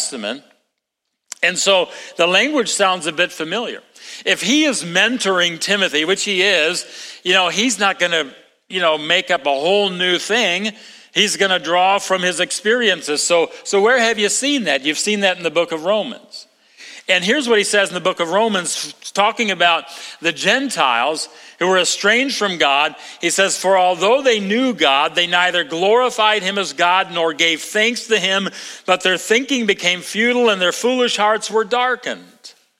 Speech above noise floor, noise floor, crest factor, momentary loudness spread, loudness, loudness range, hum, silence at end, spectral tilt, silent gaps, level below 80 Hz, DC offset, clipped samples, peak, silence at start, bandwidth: 59 dB; -76 dBFS; 18 dB; 8 LU; -16 LUFS; 2 LU; none; 0.3 s; -2 dB/octave; none; -70 dBFS; under 0.1%; under 0.1%; 0 dBFS; 0 s; 16.5 kHz